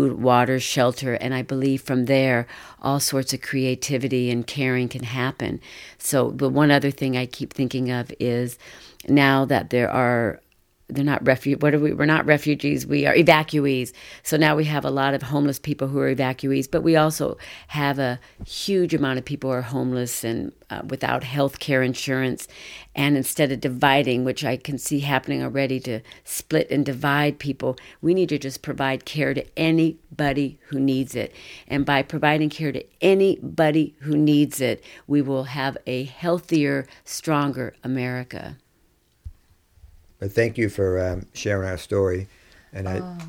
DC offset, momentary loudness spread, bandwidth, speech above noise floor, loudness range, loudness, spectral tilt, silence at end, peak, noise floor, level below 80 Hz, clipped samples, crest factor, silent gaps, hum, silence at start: under 0.1%; 12 LU; 17.5 kHz; 40 dB; 5 LU; -22 LUFS; -5.5 dB/octave; 0 s; 0 dBFS; -62 dBFS; -52 dBFS; under 0.1%; 22 dB; none; none; 0 s